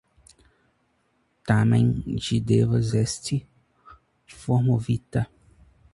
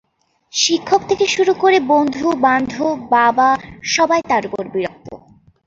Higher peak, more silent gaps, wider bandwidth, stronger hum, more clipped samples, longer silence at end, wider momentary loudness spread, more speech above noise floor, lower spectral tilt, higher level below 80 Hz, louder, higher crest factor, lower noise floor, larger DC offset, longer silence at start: second, -6 dBFS vs -2 dBFS; neither; first, 11.5 kHz vs 7.8 kHz; neither; neither; first, 0.7 s vs 0.5 s; about the same, 10 LU vs 10 LU; about the same, 46 dB vs 44 dB; first, -6.5 dB/octave vs -2.5 dB/octave; first, -48 dBFS vs -54 dBFS; second, -24 LUFS vs -16 LUFS; first, 20 dB vs 14 dB; first, -69 dBFS vs -60 dBFS; neither; first, 1.45 s vs 0.55 s